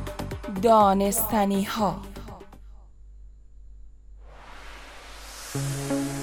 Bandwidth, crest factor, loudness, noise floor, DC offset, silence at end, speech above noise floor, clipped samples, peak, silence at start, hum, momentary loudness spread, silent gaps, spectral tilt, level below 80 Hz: 18 kHz; 18 dB; -24 LUFS; -46 dBFS; under 0.1%; 0 s; 25 dB; under 0.1%; -8 dBFS; 0 s; 50 Hz at -50 dBFS; 25 LU; none; -5 dB/octave; -44 dBFS